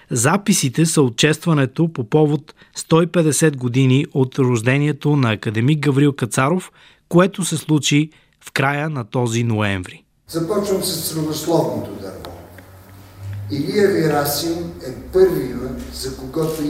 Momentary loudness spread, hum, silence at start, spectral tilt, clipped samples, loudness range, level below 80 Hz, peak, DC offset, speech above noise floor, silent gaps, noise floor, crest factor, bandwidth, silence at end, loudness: 13 LU; none; 0.1 s; -5 dB/octave; under 0.1%; 5 LU; -46 dBFS; -2 dBFS; under 0.1%; 24 dB; none; -42 dBFS; 16 dB; 16 kHz; 0 s; -18 LUFS